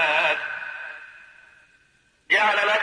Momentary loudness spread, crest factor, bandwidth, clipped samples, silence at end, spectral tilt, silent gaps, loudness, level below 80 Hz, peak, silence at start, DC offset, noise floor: 20 LU; 18 dB; 10.5 kHz; under 0.1%; 0 s; -1.5 dB/octave; none; -21 LUFS; -74 dBFS; -8 dBFS; 0 s; under 0.1%; -62 dBFS